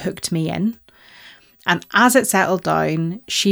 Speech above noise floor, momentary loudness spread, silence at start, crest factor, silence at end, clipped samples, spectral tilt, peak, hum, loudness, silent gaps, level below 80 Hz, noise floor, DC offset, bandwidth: 28 dB; 10 LU; 0 s; 18 dB; 0 s; under 0.1%; -4 dB/octave; -2 dBFS; none; -18 LUFS; none; -56 dBFS; -46 dBFS; under 0.1%; over 20 kHz